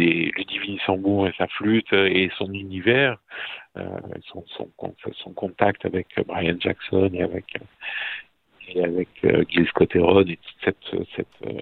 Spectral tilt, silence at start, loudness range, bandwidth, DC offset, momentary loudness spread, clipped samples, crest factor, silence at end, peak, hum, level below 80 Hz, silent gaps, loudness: -9 dB/octave; 0 s; 5 LU; 4.5 kHz; under 0.1%; 16 LU; under 0.1%; 22 dB; 0 s; 0 dBFS; none; -54 dBFS; none; -23 LUFS